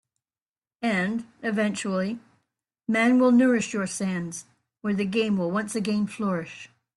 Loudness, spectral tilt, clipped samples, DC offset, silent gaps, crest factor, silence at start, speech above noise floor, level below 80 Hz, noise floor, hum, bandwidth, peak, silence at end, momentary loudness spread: -25 LUFS; -5.5 dB/octave; under 0.1%; under 0.1%; none; 16 dB; 0.8 s; over 66 dB; -68 dBFS; under -90 dBFS; none; 12 kHz; -10 dBFS; 0.3 s; 16 LU